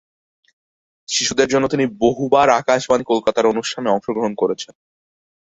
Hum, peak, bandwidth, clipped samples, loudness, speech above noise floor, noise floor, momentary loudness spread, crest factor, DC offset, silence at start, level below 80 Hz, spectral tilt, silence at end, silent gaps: none; -2 dBFS; 8.4 kHz; under 0.1%; -18 LUFS; over 73 dB; under -90 dBFS; 7 LU; 18 dB; under 0.1%; 1.1 s; -54 dBFS; -3.5 dB/octave; 0.95 s; none